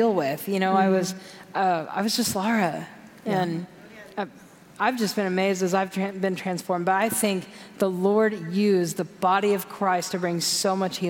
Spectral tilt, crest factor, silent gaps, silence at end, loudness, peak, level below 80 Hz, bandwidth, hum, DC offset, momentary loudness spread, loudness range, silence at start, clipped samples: -4.5 dB/octave; 16 dB; none; 0 s; -24 LUFS; -8 dBFS; -70 dBFS; 17 kHz; none; under 0.1%; 12 LU; 4 LU; 0 s; under 0.1%